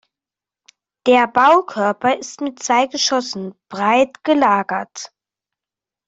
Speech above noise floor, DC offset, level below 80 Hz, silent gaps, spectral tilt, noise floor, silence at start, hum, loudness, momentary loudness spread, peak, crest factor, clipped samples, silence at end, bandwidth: 72 dB; under 0.1%; -64 dBFS; none; -3 dB/octave; -89 dBFS; 1.05 s; none; -17 LUFS; 15 LU; -2 dBFS; 16 dB; under 0.1%; 1 s; 8 kHz